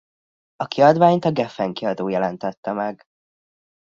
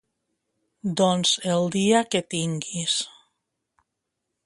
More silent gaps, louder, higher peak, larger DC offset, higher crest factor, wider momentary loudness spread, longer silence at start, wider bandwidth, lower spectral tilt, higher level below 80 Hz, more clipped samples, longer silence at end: first, 2.57-2.63 s vs none; first, -20 LUFS vs -23 LUFS; first, 0 dBFS vs -6 dBFS; neither; about the same, 20 dB vs 20 dB; first, 14 LU vs 8 LU; second, 0.6 s vs 0.85 s; second, 7.4 kHz vs 11.5 kHz; first, -7.5 dB/octave vs -4 dB/octave; about the same, -64 dBFS vs -68 dBFS; neither; second, 1 s vs 1.35 s